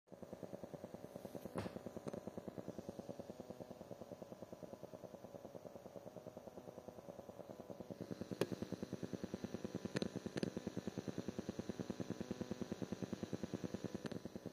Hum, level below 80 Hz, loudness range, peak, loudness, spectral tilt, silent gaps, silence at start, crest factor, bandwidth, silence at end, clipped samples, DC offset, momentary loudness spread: none; -76 dBFS; 8 LU; -22 dBFS; -49 LUFS; -6 dB/octave; none; 0.05 s; 26 dB; 15.5 kHz; 0 s; under 0.1%; under 0.1%; 10 LU